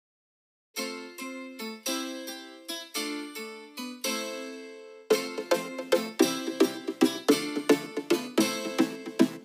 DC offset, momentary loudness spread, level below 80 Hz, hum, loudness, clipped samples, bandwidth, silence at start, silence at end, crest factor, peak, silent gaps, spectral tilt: under 0.1%; 13 LU; -84 dBFS; none; -30 LUFS; under 0.1%; 15.5 kHz; 0.75 s; 0 s; 22 dB; -8 dBFS; none; -3 dB/octave